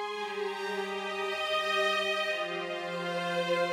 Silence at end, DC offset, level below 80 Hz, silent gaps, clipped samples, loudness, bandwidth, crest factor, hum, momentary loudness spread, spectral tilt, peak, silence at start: 0 s; under 0.1%; -76 dBFS; none; under 0.1%; -31 LUFS; 16 kHz; 16 dB; none; 7 LU; -3.5 dB/octave; -16 dBFS; 0 s